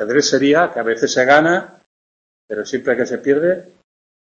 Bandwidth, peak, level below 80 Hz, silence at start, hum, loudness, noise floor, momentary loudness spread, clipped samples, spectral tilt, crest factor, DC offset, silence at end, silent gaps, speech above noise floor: 7.8 kHz; 0 dBFS; -60 dBFS; 0 s; none; -16 LUFS; under -90 dBFS; 12 LU; under 0.1%; -4 dB/octave; 18 dB; under 0.1%; 0.7 s; 1.86-2.48 s; over 74 dB